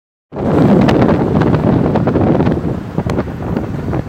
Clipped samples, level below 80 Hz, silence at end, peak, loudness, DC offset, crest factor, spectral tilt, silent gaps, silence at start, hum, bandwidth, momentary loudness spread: under 0.1%; -30 dBFS; 0 s; 0 dBFS; -14 LUFS; under 0.1%; 14 dB; -9 dB/octave; none; 0.3 s; none; 9.2 kHz; 10 LU